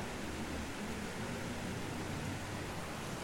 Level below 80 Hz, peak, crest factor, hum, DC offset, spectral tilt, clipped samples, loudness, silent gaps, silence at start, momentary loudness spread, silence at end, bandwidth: -54 dBFS; -28 dBFS; 12 dB; none; under 0.1%; -4.5 dB/octave; under 0.1%; -41 LUFS; none; 0 s; 1 LU; 0 s; 16.5 kHz